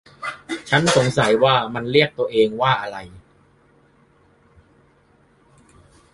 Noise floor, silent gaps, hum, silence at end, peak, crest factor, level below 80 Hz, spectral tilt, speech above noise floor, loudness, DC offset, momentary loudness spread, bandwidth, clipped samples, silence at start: -57 dBFS; none; none; 2.95 s; 0 dBFS; 22 dB; -54 dBFS; -4.5 dB/octave; 39 dB; -19 LUFS; under 0.1%; 15 LU; 11.5 kHz; under 0.1%; 0.2 s